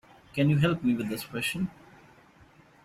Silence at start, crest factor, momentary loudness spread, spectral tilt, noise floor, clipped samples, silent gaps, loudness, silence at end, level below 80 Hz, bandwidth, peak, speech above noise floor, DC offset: 0.35 s; 20 dB; 11 LU; -6 dB/octave; -57 dBFS; under 0.1%; none; -28 LUFS; 1.15 s; -60 dBFS; 14.5 kHz; -10 dBFS; 30 dB; under 0.1%